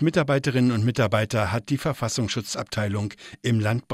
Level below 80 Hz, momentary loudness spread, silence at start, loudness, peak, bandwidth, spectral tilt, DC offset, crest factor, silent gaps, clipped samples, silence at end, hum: -54 dBFS; 7 LU; 0 s; -24 LUFS; -8 dBFS; 15 kHz; -5.5 dB/octave; under 0.1%; 16 dB; none; under 0.1%; 0 s; none